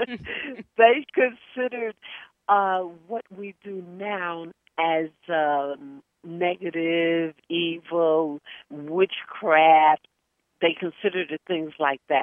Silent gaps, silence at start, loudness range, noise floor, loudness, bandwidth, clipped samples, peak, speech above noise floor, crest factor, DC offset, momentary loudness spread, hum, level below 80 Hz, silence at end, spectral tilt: none; 0 s; 6 LU; -75 dBFS; -24 LUFS; 4.3 kHz; under 0.1%; -2 dBFS; 52 dB; 22 dB; under 0.1%; 19 LU; none; -70 dBFS; 0 s; -7.5 dB/octave